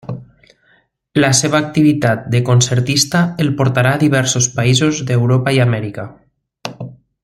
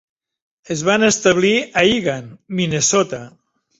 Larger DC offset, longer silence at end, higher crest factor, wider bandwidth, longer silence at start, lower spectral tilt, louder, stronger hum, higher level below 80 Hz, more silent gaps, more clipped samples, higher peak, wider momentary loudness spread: neither; second, 0.3 s vs 0.5 s; about the same, 14 dB vs 16 dB; first, 14 kHz vs 8.2 kHz; second, 0.05 s vs 0.7 s; about the same, -4.5 dB/octave vs -3.5 dB/octave; about the same, -14 LUFS vs -16 LUFS; neither; about the same, -50 dBFS vs -52 dBFS; neither; neither; about the same, 0 dBFS vs -2 dBFS; first, 17 LU vs 13 LU